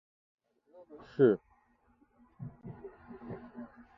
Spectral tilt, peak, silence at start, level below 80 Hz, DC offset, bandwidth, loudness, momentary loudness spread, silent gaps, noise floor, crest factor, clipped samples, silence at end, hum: -8 dB/octave; -12 dBFS; 0.9 s; -70 dBFS; under 0.1%; 5.6 kHz; -30 LUFS; 23 LU; none; -69 dBFS; 24 dB; under 0.1%; 0.3 s; none